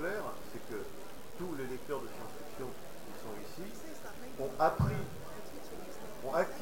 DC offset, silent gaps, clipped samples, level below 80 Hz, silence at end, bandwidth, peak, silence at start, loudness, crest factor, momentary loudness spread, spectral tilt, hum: 0.8%; none; under 0.1%; -56 dBFS; 0 s; 16 kHz; -18 dBFS; 0 s; -40 LUFS; 22 dB; 15 LU; -6 dB/octave; none